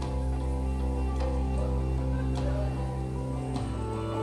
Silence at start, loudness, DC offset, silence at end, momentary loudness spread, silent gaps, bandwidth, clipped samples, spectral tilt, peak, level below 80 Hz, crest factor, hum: 0 s; -31 LUFS; under 0.1%; 0 s; 3 LU; none; 10.5 kHz; under 0.1%; -8 dB/octave; -18 dBFS; -32 dBFS; 10 dB; none